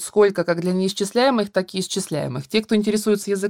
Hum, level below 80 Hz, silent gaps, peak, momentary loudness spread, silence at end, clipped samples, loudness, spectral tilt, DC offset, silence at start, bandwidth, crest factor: none; -62 dBFS; none; -4 dBFS; 6 LU; 0 s; under 0.1%; -21 LUFS; -5 dB/octave; under 0.1%; 0 s; 17 kHz; 16 dB